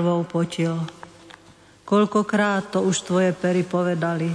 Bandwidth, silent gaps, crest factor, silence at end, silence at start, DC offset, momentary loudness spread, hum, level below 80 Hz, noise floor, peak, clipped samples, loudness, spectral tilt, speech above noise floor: 11 kHz; none; 14 dB; 0 s; 0 s; under 0.1%; 5 LU; none; -64 dBFS; -51 dBFS; -8 dBFS; under 0.1%; -22 LUFS; -6 dB/octave; 29 dB